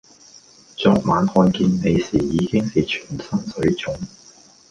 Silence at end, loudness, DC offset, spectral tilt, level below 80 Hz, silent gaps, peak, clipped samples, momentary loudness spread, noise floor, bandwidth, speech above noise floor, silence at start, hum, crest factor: 0.65 s; -20 LUFS; under 0.1%; -6.5 dB/octave; -44 dBFS; none; -2 dBFS; under 0.1%; 11 LU; -48 dBFS; 9.4 kHz; 30 dB; 0.8 s; none; 18 dB